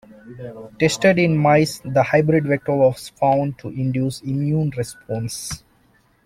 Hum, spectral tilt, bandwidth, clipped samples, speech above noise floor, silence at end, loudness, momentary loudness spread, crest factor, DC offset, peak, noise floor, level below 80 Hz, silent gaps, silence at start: none; -6 dB/octave; 15.5 kHz; under 0.1%; 39 dB; 0.7 s; -19 LUFS; 14 LU; 16 dB; under 0.1%; -4 dBFS; -58 dBFS; -52 dBFS; none; 0.25 s